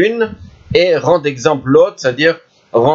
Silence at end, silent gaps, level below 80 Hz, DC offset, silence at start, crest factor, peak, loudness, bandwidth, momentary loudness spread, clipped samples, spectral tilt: 0 s; none; -46 dBFS; under 0.1%; 0 s; 12 dB; 0 dBFS; -13 LUFS; 7.6 kHz; 8 LU; under 0.1%; -5.5 dB/octave